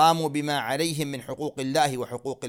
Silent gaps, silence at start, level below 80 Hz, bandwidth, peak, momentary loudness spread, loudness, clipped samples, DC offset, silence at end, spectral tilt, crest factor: none; 0 s; -64 dBFS; 17 kHz; -6 dBFS; 8 LU; -27 LUFS; under 0.1%; under 0.1%; 0 s; -4.5 dB/octave; 20 dB